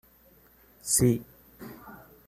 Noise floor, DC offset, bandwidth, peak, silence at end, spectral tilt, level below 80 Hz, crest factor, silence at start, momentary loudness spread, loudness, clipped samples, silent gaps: -59 dBFS; under 0.1%; 15 kHz; -10 dBFS; 0.3 s; -4.5 dB/octave; -56 dBFS; 22 dB; 0.85 s; 24 LU; -25 LUFS; under 0.1%; none